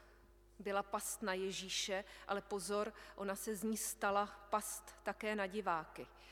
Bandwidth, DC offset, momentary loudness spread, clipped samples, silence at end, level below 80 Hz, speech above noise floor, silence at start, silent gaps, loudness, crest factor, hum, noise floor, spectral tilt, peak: 18 kHz; under 0.1%; 8 LU; under 0.1%; 0 s; -68 dBFS; 24 dB; 0 s; none; -41 LUFS; 18 dB; none; -65 dBFS; -2.5 dB/octave; -24 dBFS